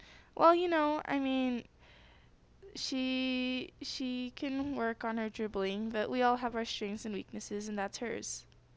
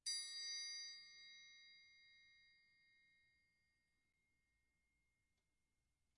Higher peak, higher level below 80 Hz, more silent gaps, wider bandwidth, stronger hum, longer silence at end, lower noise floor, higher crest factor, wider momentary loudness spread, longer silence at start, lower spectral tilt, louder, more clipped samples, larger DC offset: first, -12 dBFS vs -34 dBFS; first, -64 dBFS vs under -90 dBFS; neither; second, 8 kHz vs 12 kHz; neither; second, 0.35 s vs 3.1 s; second, -62 dBFS vs -90 dBFS; about the same, 22 dB vs 24 dB; second, 12 LU vs 22 LU; about the same, 0 s vs 0.05 s; first, -4 dB/octave vs 4.5 dB/octave; first, -34 LUFS vs -49 LUFS; neither; neither